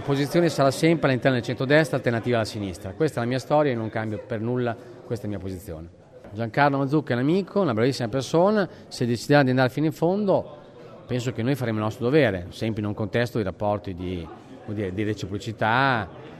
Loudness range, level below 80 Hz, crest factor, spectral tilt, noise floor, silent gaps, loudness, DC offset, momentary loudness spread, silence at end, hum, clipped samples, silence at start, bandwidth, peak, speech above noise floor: 5 LU; -56 dBFS; 20 dB; -6.5 dB/octave; -44 dBFS; none; -24 LUFS; under 0.1%; 12 LU; 0 s; none; under 0.1%; 0 s; 13.5 kHz; -4 dBFS; 21 dB